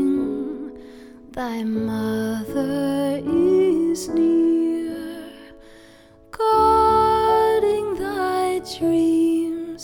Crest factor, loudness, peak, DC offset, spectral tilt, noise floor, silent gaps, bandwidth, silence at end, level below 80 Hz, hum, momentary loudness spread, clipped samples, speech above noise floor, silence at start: 14 dB; -20 LUFS; -8 dBFS; under 0.1%; -6 dB/octave; -48 dBFS; none; 18 kHz; 0 s; -46 dBFS; none; 15 LU; under 0.1%; 28 dB; 0 s